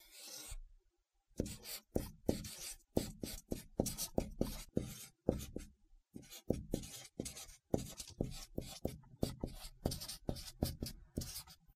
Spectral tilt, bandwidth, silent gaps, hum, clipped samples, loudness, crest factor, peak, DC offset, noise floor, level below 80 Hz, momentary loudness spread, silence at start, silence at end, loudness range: -5 dB/octave; 15.5 kHz; none; none; under 0.1%; -44 LUFS; 28 dB; -16 dBFS; under 0.1%; -80 dBFS; -52 dBFS; 10 LU; 0 s; 0.05 s; 3 LU